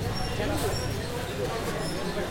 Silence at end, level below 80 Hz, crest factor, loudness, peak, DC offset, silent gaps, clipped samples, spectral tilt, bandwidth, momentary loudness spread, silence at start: 0 s; -40 dBFS; 14 dB; -30 LUFS; -16 dBFS; under 0.1%; none; under 0.1%; -5 dB/octave; 16.5 kHz; 3 LU; 0 s